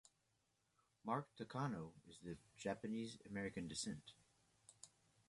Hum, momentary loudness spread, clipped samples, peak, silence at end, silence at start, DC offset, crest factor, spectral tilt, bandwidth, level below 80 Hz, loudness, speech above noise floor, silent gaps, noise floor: none; 18 LU; under 0.1%; -28 dBFS; 0.4 s; 1.05 s; under 0.1%; 24 dB; -5 dB/octave; 11.5 kHz; -76 dBFS; -49 LUFS; 36 dB; none; -84 dBFS